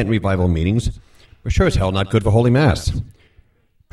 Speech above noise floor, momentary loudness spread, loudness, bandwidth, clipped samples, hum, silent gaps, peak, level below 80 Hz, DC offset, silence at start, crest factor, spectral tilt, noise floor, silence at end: 41 dB; 13 LU; -18 LUFS; 12.5 kHz; under 0.1%; none; none; 0 dBFS; -28 dBFS; under 0.1%; 0 s; 18 dB; -7 dB/octave; -58 dBFS; 0.85 s